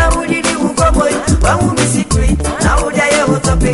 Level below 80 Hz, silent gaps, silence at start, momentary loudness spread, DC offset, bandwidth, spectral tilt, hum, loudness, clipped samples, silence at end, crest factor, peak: -18 dBFS; none; 0 s; 2 LU; under 0.1%; 11.5 kHz; -4.5 dB/octave; none; -13 LUFS; under 0.1%; 0 s; 10 dB; 0 dBFS